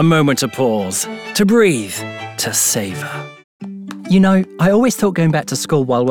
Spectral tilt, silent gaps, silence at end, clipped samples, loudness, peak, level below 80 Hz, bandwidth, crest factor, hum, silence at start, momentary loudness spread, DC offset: -5 dB/octave; 3.44-3.60 s; 0 s; under 0.1%; -15 LUFS; -2 dBFS; -52 dBFS; 20 kHz; 12 dB; none; 0 s; 17 LU; under 0.1%